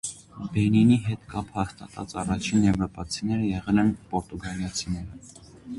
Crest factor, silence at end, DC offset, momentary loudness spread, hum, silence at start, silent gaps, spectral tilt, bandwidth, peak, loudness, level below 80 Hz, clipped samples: 16 dB; 0 s; under 0.1%; 15 LU; none; 0.05 s; none; -6 dB/octave; 11.5 kHz; -10 dBFS; -26 LUFS; -46 dBFS; under 0.1%